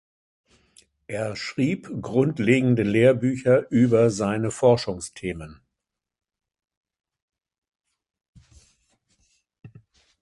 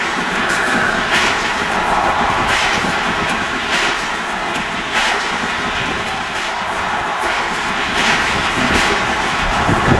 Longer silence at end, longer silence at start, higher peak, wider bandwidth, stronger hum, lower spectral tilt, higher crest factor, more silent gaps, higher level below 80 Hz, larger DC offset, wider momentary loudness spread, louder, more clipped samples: first, 0.55 s vs 0 s; first, 1.1 s vs 0 s; second, -4 dBFS vs 0 dBFS; about the same, 11.5 kHz vs 12 kHz; neither; first, -6.5 dB/octave vs -3 dB/octave; about the same, 20 dB vs 16 dB; first, 6.77-6.83 s, 7.22-7.28 s, 7.58-7.62 s, 8.28-8.33 s, 9.59-9.63 s vs none; second, -56 dBFS vs -34 dBFS; second, under 0.1% vs 0.1%; first, 13 LU vs 5 LU; second, -22 LUFS vs -16 LUFS; neither